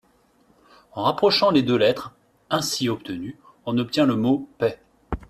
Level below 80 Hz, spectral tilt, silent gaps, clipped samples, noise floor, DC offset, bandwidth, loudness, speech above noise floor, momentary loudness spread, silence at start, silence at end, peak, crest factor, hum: -50 dBFS; -5 dB/octave; none; under 0.1%; -60 dBFS; under 0.1%; 14.5 kHz; -22 LUFS; 39 dB; 17 LU; 0.95 s; 0.05 s; -6 dBFS; 18 dB; none